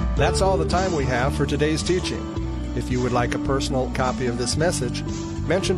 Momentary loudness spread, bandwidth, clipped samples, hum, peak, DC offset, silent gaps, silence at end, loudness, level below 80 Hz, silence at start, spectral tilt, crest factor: 8 LU; 13 kHz; under 0.1%; none; -6 dBFS; under 0.1%; none; 0 s; -23 LUFS; -30 dBFS; 0 s; -5 dB/octave; 16 dB